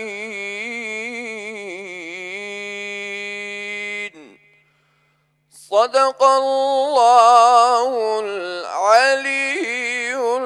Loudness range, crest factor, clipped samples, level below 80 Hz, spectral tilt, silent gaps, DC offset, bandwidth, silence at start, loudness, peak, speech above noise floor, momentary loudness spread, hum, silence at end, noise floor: 13 LU; 18 dB; under 0.1%; -76 dBFS; -1.5 dB/octave; none; under 0.1%; 12 kHz; 0 s; -18 LUFS; -2 dBFS; 48 dB; 17 LU; none; 0 s; -63 dBFS